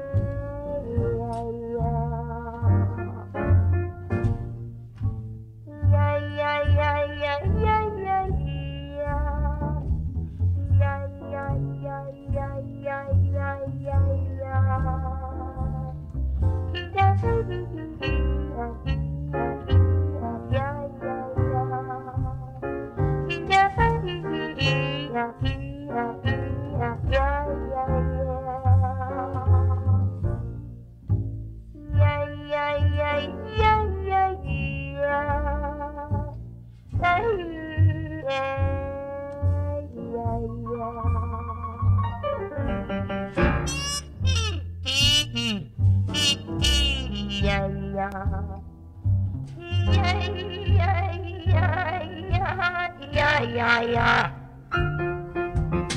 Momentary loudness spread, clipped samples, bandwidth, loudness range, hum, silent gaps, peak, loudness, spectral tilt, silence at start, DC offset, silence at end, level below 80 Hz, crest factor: 11 LU; under 0.1%; 12 kHz; 4 LU; none; none; -4 dBFS; -26 LUFS; -5.5 dB/octave; 0 s; under 0.1%; 0 s; -34 dBFS; 20 dB